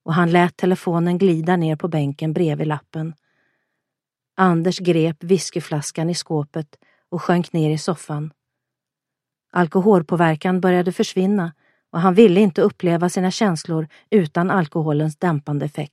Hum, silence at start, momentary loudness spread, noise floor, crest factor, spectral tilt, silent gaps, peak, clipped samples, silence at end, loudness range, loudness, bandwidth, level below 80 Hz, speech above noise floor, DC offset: none; 0.05 s; 11 LU; -85 dBFS; 20 dB; -6.5 dB/octave; none; 0 dBFS; under 0.1%; 0.05 s; 6 LU; -19 LUFS; 12.5 kHz; -66 dBFS; 67 dB; under 0.1%